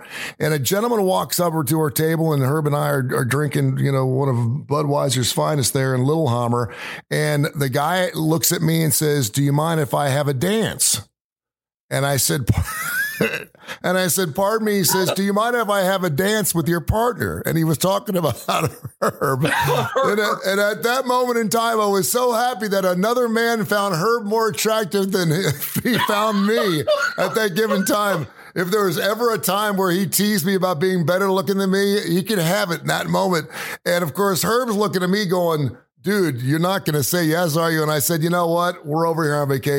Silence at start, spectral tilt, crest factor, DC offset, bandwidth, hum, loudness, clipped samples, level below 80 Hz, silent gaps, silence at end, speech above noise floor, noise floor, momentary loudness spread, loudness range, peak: 0 s; -4.5 dB/octave; 16 dB; under 0.1%; 17 kHz; none; -19 LUFS; under 0.1%; -46 dBFS; 11.21-11.36 s, 11.74-11.89 s; 0 s; over 71 dB; under -90 dBFS; 4 LU; 2 LU; -2 dBFS